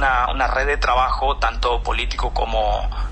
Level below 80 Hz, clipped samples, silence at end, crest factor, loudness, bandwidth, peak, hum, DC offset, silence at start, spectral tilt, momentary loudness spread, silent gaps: -24 dBFS; under 0.1%; 0 s; 12 dB; -20 LUFS; 8.4 kHz; -8 dBFS; none; under 0.1%; 0 s; -4.5 dB/octave; 5 LU; none